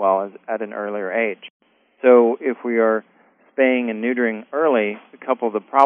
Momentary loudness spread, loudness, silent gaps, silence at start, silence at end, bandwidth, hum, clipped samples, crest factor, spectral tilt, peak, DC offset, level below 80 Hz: 12 LU; -20 LUFS; 1.50-1.60 s; 0 s; 0 s; 3.8 kHz; none; under 0.1%; 20 dB; 0.5 dB/octave; 0 dBFS; under 0.1%; -86 dBFS